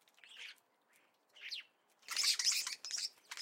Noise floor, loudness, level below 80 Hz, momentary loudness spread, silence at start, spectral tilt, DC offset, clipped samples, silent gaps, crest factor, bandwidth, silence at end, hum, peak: -73 dBFS; -36 LUFS; under -90 dBFS; 21 LU; 0.25 s; 5.5 dB/octave; under 0.1%; under 0.1%; none; 22 dB; 16.5 kHz; 0 s; none; -20 dBFS